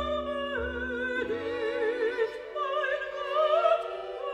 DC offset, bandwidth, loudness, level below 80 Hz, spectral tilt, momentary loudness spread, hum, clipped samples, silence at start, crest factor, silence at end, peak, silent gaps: under 0.1%; 10 kHz; -30 LUFS; -52 dBFS; -5 dB/octave; 7 LU; none; under 0.1%; 0 s; 18 dB; 0 s; -12 dBFS; none